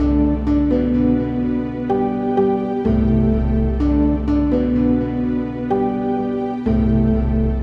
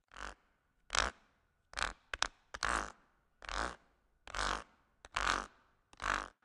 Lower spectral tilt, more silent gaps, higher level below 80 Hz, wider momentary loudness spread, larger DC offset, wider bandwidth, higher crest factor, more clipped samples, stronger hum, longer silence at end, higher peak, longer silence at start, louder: first, -10.5 dB/octave vs -1.5 dB/octave; neither; first, -24 dBFS vs -54 dBFS; second, 4 LU vs 14 LU; neither; second, 5.8 kHz vs 13 kHz; second, 12 dB vs 34 dB; neither; neither; second, 0 s vs 0.15 s; first, -4 dBFS vs -8 dBFS; second, 0 s vs 0.15 s; first, -18 LUFS vs -39 LUFS